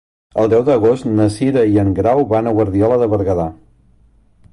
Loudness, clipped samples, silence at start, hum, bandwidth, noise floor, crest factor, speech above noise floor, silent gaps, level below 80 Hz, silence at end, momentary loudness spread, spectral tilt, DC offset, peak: -15 LUFS; under 0.1%; 0.35 s; none; 11.5 kHz; -51 dBFS; 12 dB; 37 dB; none; -38 dBFS; 1 s; 5 LU; -8.5 dB/octave; under 0.1%; -4 dBFS